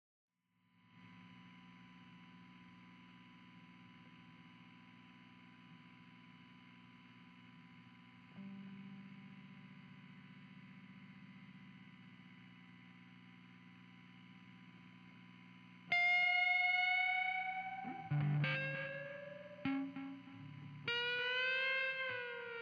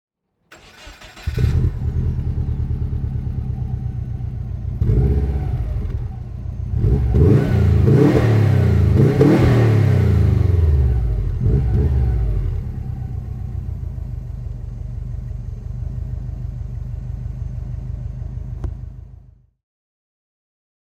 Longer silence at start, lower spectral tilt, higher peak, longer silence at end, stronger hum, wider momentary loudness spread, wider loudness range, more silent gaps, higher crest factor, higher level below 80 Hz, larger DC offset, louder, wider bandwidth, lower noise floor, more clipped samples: first, 0.95 s vs 0.5 s; second, -2.5 dB/octave vs -9 dB/octave; second, -26 dBFS vs -2 dBFS; second, 0 s vs 1.65 s; first, 60 Hz at -65 dBFS vs none; first, 27 LU vs 16 LU; first, 25 LU vs 15 LU; neither; about the same, 18 dB vs 18 dB; second, -86 dBFS vs -24 dBFS; neither; second, -37 LUFS vs -19 LUFS; second, 7.6 kHz vs 8.4 kHz; first, -78 dBFS vs -50 dBFS; neither